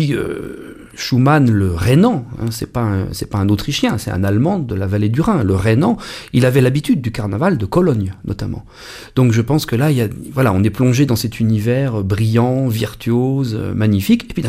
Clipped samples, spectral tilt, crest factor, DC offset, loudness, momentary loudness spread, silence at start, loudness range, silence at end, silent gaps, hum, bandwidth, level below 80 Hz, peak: under 0.1%; -7 dB/octave; 14 dB; under 0.1%; -16 LUFS; 11 LU; 0 s; 2 LU; 0 s; none; none; 15.5 kHz; -38 dBFS; 0 dBFS